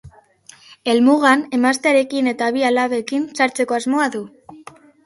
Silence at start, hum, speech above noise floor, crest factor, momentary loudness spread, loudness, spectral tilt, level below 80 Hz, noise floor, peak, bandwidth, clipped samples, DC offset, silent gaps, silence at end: 0.05 s; none; 31 dB; 18 dB; 9 LU; -17 LUFS; -3.5 dB/octave; -60 dBFS; -47 dBFS; 0 dBFS; 11.5 kHz; under 0.1%; under 0.1%; none; 0.5 s